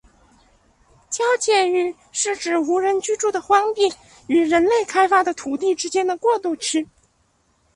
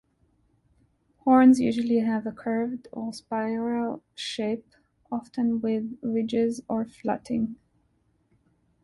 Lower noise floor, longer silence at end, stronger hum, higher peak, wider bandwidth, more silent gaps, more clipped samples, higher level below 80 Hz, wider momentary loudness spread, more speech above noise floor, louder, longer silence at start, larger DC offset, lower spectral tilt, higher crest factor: second, -63 dBFS vs -69 dBFS; second, 0.9 s vs 1.3 s; neither; first, -4 dBFS vs -8 dBFS; about the same, 11.5 kHz vs 11.5 kHz; neither; neither; about the same, -60 dBFS vs -64 dBFS; second, 7 LU vs 15 LU; about the same, 44 dB vs 44 dB; first, -20 LUFS vs -26 LUFS; second, 1.1 s vs 1.25 s; neither; second, -1.5 dB/octave vs -6 dB/octave; about the same, 18 dB vs 18 dB